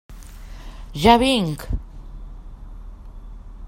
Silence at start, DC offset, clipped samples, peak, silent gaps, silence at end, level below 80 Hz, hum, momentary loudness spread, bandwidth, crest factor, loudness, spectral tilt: 0.1 s; under 0.1%; under 0.1%; 0 dBFS; none; 0 s; -34 dBFS; none; 27 LU; 16 kHz; 22 dB; -19 LUFS; -5 dB/octave